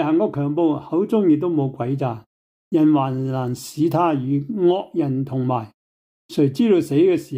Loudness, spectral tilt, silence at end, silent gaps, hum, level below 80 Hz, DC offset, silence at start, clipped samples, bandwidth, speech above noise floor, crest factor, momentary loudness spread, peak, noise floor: -20 LUFS; -8 dB/octave; 0 s; 2.26-2.71 s, 5.74-6.29 s; none; -64 dBFS; under 0.1%; 0 s; under 0.1%; 16 kHz; over 71 dB; 14 dB; 8 LU; -6 dBFS; under -90 dBFS